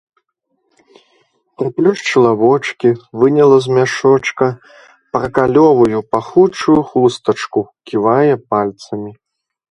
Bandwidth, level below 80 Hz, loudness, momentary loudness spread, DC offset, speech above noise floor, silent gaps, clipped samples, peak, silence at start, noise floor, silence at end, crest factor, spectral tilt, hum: 11 kHz; -50 dBFS; -13 LUFS; 11 LU; under 0.1%; 54 dB; none; under 0.1%; 0 dBFS; 1.6 s; -67 dBFS; 0.6 s; 14 dB; -6.5 dB/octave; none